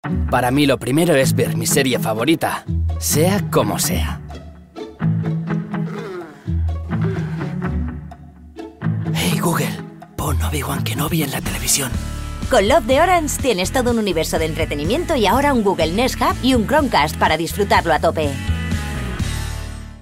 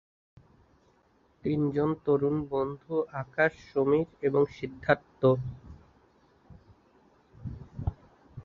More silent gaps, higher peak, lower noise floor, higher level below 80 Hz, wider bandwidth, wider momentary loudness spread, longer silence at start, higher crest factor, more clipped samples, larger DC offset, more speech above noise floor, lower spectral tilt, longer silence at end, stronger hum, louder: neither; first, -2 dBFS vs -8 dBFS; second, -38 dBFS vs -66 dBFS; first, -30 dBFS vs -52 dBFS; first, 16.5 kHz vs 6.8 kHz; second, 13 LU vs 16 LU; second, 0.05 s vs 1.45 s; second, 16 dB vs 22 dB; neither; neither; second, 21 dB vs 38 dB; second, -4.5 dB/octave vs -9 dB/octave; about the same, 0.05 s vs 0.05 s; neither; first, -18 LUFS vs -29 LUFS